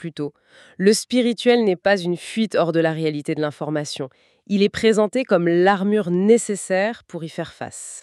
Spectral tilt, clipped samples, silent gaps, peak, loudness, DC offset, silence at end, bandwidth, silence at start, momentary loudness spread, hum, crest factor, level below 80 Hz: -5 dB/octave; under 0.1%; none; -4 dBFS; -20 LUFS; under 0.1%; 0 s; 13 kHz; 0 s; 14 LU; none; 16 dB; -62 dBFS